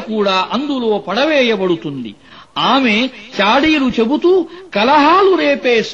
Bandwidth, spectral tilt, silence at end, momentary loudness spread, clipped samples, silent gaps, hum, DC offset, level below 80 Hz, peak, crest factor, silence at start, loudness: 7.8 kHz; -5 dB/octave; 0 s; 10 LU; under 0.1%; none; none; 0.3%; -48 dBFS; -2 dBFS; 12 dB; 0 s; -13 LUFS